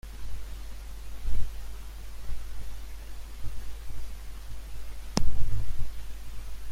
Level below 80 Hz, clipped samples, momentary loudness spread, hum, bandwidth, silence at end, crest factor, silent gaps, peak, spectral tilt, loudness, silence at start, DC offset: -36 dBFS; under 0.1%; 11 LU; none; 12.5 kHz; 0 s; 16 dB; none; -6 dBFS; -5 dB/octave; -40 LUFS; 0.05 s; under 0.1%